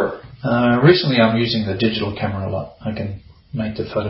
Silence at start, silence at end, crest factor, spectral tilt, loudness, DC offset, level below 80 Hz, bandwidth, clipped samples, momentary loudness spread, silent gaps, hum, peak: 0 s; 0 s; 18 dB; -10 dB/octave; -19 LUFS; under 0.1%; -46 dBFS; 5.8 kHz; under 0.1%; 15 LU; none; none; 0 dBFS